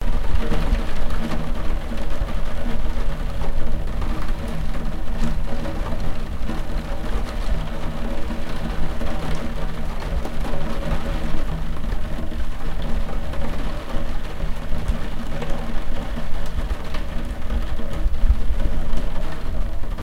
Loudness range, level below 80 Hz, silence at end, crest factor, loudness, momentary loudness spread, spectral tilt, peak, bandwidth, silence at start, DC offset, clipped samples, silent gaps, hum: 2 LU; -22 dBFS; 0 s; 14 dB; -29 LUFS; 4 LU; -6.5 dB/octave; -2 dBFS; 6.2 kHz; 0 s; under 0.1%; under 0.1%; none; none